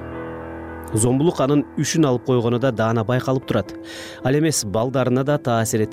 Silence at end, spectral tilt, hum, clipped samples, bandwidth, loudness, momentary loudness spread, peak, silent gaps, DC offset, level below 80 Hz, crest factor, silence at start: 0 s; -5.5 dB/octave; none; under 0.1%; 16.5 kHz; -20 LUFS; 14 LU; -8 dBFS; none; under 0.1%; -48 dBFS; 12 dB; 0 s